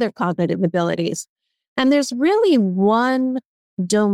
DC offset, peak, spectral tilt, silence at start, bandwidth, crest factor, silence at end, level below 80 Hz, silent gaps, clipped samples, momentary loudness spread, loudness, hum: under 0.1%; -4 dBFS; -5.5 dB/octave; 0 s; 14 kHz; 14 dB; 0 s; -68 dBFS; 1.29-1.36 s, 1.68-1.76 s, 3.45-3.77 s; under 0.1%; 13 LU; -19 LUFS; none